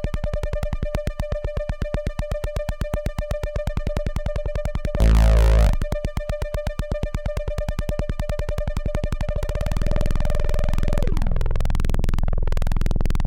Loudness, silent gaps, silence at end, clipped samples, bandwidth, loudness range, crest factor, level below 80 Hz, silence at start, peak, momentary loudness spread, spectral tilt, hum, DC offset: -26 LUFS; none; 0 s; under 0.1%; 12.5 kHz; 6 LU; 16 dB; -22 dBFS; 0 s; -4 dBFS; 9 LU; -7 dB/octave; none; under 0.1%